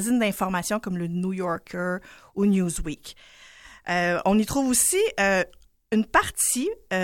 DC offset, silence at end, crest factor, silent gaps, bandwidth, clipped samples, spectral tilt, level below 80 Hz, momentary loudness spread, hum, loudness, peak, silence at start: under 0.1%; 0 s; 20 dB; none; 17 kHz; under 0.1%; -4 dB/octave; -46 dBFS; 12 LU; none; -24 LUFS; -6 dBFS; 0 s